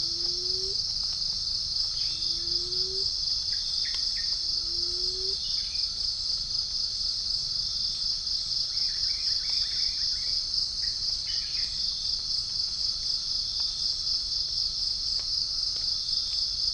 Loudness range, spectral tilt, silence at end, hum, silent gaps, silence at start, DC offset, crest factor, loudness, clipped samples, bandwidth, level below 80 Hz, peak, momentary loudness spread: 1 LU; 0 dB/octave; 0 s; none; none; 0 s; under 0.1%; 16 dB; -26 LUFS; under 0.1%; 10.5 kHz; -48 dBFS; -14 dBFS; 2 LU